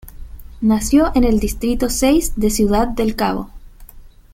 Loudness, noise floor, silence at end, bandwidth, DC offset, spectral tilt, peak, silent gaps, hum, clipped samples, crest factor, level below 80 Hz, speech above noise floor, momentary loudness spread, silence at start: -17 LUFS; -39 dBFS; 0.25 s; 16.5 kHz; under 0.1%; -5 dB/octave; -2 dBFS; none; none; under 0.1%; 16 dB; -28 dBFS; 24 dB; 7 LU; 0.05 s